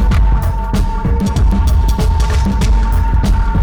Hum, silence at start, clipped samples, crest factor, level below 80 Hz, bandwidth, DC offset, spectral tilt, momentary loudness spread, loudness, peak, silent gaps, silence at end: none; 0 s; under 0.1%; 6 dB; -12 dBFS; 14 kHz; under 0.1%; -6.5 dB/octave; 3 LU; -15 LUFS; -4 dBFS; none; 0 s